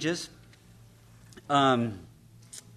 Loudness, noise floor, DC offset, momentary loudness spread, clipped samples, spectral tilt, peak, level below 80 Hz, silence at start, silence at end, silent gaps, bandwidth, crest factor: -27 LUFS; -55 dBFS; under 0.1%; 23 LU; under 0.1%; -5 dB/octave; -10 dBFS; -64 dBFS; 0 s; 0.15 s; none; 13.5 kHz; 20 dB